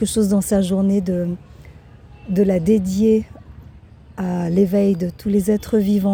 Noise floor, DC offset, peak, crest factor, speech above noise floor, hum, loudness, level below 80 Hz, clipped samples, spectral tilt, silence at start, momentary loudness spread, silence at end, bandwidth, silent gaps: -43 dBFS; under 0.1%; -6 dBFS; 14 dB; 26 dB; none; -18 LUFS; -42 dBFS; under 0.1%; -7 dB/octave; 0 s; 10 LU; 0 s; 19 kHz; none